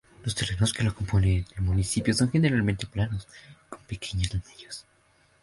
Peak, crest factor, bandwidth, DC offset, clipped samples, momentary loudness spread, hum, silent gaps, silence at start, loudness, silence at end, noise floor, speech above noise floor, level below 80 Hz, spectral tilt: -8 dBFS; 20 dB; 11.5 kHz; under 0.1%; under 0.1%; 18 LU; none; none; 0.2 s; -27 LUFS; 0.6 s; -63 dBFS; 37 dB; -40 dBFS; -5 dB/octave